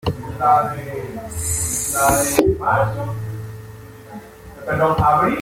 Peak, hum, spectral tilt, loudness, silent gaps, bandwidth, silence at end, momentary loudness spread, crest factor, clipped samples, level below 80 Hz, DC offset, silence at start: 0 dBFS; none; -4.5 dB/octave; -19 LUFS; none; 16.5 kHz; 0 s; 22 LU; 20 dB; under 0.1%; -38 dBFS; under 0.1%; 0.05 s